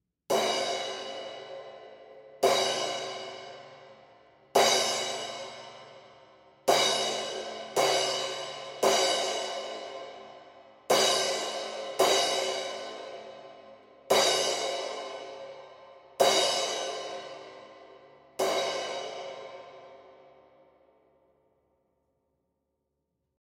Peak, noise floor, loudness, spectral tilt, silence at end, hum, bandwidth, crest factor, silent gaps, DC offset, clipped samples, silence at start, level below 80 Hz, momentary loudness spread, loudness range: -8 dBFS; -81 dBFS; -28 LUFS; -1 dB/octave; 3.3 s; none; 16 kHz; 22 dB; none; under 0.1%; under 0.1%; 0.3 s; -76 dBFS; 23 LU; 8 LU